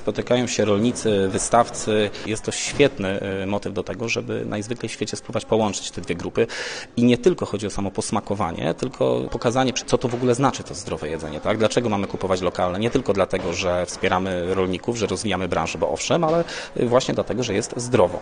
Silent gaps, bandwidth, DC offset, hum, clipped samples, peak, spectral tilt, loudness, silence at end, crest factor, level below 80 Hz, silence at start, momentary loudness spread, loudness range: none; 10 kHz; under 0.1%; none; under 0.1%; -2 dBFS; -4.5 dB/octave; -23 LUFS; 0 s; 20 dB; -46 dBFS; 0 s; 8 LU; 3 LU